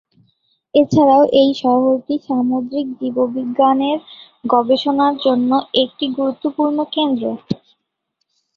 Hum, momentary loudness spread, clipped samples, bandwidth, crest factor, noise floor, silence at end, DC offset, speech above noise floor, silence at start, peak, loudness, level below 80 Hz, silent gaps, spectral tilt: none; 10 LU; under 0.1%; 7.2 kHz; 16 dB; -73 dBFS; 1 s; under 0.1%; 57 dB; 0.75 s; -2 dBFS; -16 LUFS; -58 dBFS; none; -7 dB/octave